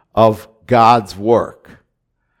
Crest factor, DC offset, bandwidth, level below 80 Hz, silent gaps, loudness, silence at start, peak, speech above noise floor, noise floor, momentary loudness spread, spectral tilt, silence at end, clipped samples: 16 dB; under 0.1%; 16 kHz; -48 dBFS; none; -14 LUFS; 0.15 s; 0 dBFS; 55 dB; -69 dBFS; 12 LU; -6.5 dB/octave; 0.9 s; 0.2%